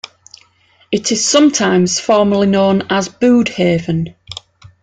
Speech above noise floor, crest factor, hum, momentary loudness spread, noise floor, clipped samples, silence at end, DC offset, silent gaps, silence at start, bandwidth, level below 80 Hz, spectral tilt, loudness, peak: 40 dB; 14 dB; none; 16 LU; -53 dBFS; under 0.1%; 0.15 s; under 0.1%; none; 0.9 s; 9.4 kHz; -50 dBFS; -4.5 dB/octave; -13 LUFS; -2 dBFS